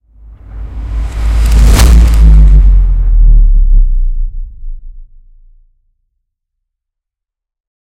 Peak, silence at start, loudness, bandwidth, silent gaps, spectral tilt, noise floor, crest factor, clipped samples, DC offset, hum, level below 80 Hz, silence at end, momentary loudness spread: 0 dBFS; 0.5 s; -10 LUFS; 14 kHz; none; -5.5 dB/octave; -81 dBFS; 8 dB; 3%; under 0.1%; none; -8 dBFS; 2.8 s; 22 LU